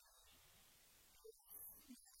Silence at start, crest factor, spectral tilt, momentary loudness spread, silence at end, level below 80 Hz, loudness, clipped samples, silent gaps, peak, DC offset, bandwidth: 0 s; 18 dB; -2 dB/octave; 12 LU; 0 s; -82 dBFS; -62 LUFS; under 0.1%; none; -46 dBFS; under 0.1%; 16.5 kHz